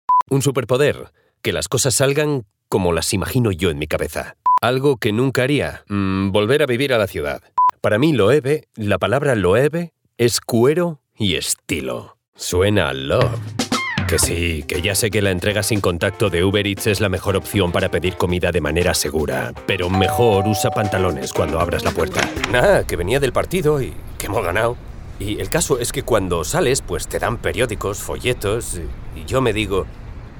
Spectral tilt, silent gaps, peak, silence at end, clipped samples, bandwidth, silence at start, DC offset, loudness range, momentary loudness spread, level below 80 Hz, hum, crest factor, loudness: -4.5 dB/octave; 0.22-0.26 s, 12.28-12.32 s; 0 dBFS; 0 s; under 0.1%; over 20 kHz; 0.1 s; under 0.1%; 3 LU; 8 LU; -36 dBFS; none; 18 dB; -19 LUFS